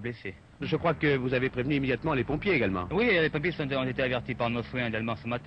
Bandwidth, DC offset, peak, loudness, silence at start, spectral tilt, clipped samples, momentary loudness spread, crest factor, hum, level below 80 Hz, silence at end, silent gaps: 8.4 kHz; under 0.1%; -14 dBFS; -28 LUFS; 0 s; -8.5 dB/octave; under 0.1%; 7 LU; 16 dB; none; -50 dBFS; 0 s; none